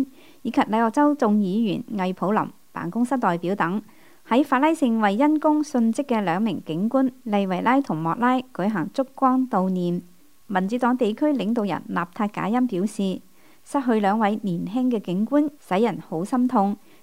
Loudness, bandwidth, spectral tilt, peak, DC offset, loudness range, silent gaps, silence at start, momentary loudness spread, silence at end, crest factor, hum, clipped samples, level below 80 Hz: -23 LUFS; 16 kHz; -7 dB/octave; -6 dBFS; 0.3%; 3 LU; none; 0 s; 8 LU; 0.3 s; 16 dB; none; under 0.1%; -70 dBFS